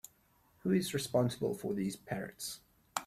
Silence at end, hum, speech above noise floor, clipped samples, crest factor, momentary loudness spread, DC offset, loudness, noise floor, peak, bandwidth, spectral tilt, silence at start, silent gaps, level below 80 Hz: 0 s; none; 34 dB; under 0.1%; 22 dB; 11 LU; under 0.1%; -36 LUFS; -69 dBFS; -16 dBFS; 15.5 kHz; -5 dB/octave; 0.65 s; none; -68 dBFS